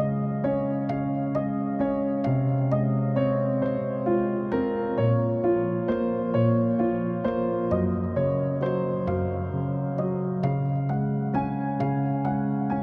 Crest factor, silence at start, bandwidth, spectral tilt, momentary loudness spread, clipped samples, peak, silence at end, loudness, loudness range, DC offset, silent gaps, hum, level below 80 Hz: 14 dB; 0 s; 4.6 kHz; -11.5 dB/octave; 4 LU; under 0.1%; -12 dBFS; 0 s; -26 LUFS; 2 LU; under 0.1%; none; none; -52 dBFS